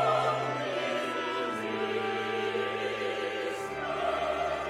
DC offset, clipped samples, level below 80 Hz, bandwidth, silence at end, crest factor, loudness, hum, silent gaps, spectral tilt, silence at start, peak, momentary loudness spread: under 0.1%; under 0.1%; -62 dBFS; 15.5 kHz; 0 s; 16 dB; -31 LUFS; none; none; -4.5 dB/octave; 0 s; -16 dBFS; 3 LU